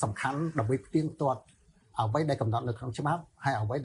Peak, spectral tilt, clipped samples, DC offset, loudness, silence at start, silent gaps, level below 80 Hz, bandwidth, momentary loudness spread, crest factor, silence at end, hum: -14 dBFS; -7 dB/octave; under 0.1%; under 0.1%; -31 LUFS; 0 s; none; -60 dBFS; 11 kHz; 4 LU; 18 dB; 0 s; none